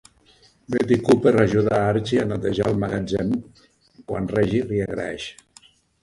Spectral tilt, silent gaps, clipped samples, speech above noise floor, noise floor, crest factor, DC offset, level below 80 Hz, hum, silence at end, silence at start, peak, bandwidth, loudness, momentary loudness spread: -7 dB/octave; none; under 0.1%; 35 dB; -56 dBFS; 20 dB; under 0.1%; -48 dBFS; none; 0.7 s; 0.7 s; -2 dBFS; 11.5 kHz; -22 LUFS; 12 LU